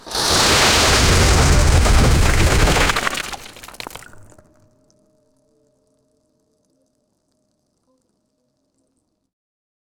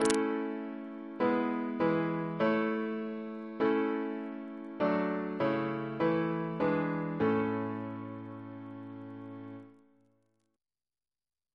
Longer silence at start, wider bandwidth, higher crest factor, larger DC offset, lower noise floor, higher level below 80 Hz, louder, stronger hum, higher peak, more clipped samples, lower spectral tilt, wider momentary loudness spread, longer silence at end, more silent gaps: about the same, 0.05 s vs 0 s; first, over 20 kHz vs 11 kHz; second, 16 dB vs 26 dB; neither; second, -69 dBFS vs under -90 dBFS; first, -22 dBFS vs -72 dBFS; first, -14 LUFS vs -33 LUFS; neither; first, -2 dBFS vs -8 dBFS; neither; second, -3.5 dB/octave vs -6 dB/octave; first, 21 LU vs 15 LU; first, 5.75 s vs 1.8 s; neither